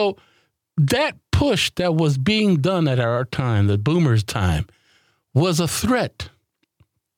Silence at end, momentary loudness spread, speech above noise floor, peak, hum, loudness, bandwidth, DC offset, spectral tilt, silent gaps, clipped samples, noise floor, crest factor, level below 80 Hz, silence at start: 0.9 s; 9 LU; 43 dB; -6 dBFS; none; -20 LUFS; 18 kHz; under 0.1%; -5.5 dB/octave; none; under 0.1%; -62 dBFS; 14 dB; -44 dBFS; 0 s